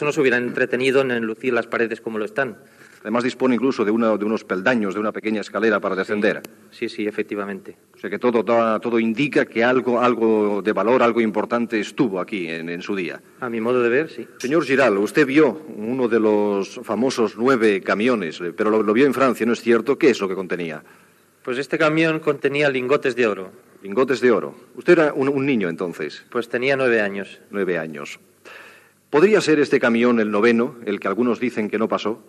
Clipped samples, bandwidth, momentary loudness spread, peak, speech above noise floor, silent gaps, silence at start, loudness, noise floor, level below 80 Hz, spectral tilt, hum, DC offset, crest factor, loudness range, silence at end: under 0.1%; 13.5 kHz; 11 LU; -2 dBFS; 29 dB; none; 0 s; -20 LUFS; -49 dBFS; -78 dBFS; -5.5 dB/octave; none; under 0.1%; 18 dB; 4 LU; 0.1 s